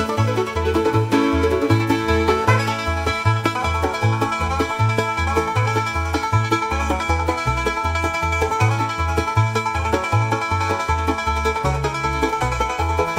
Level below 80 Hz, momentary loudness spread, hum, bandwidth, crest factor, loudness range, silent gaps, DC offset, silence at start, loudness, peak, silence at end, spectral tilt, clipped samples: -30 dBFS; 3 LU; none; 16 kHz; 16 dB; 2 LU; none; under 0.1%; 0 s; -20 LUFS; -2 dBFS; 0 s; -5.5 dB/octave; under 0.1%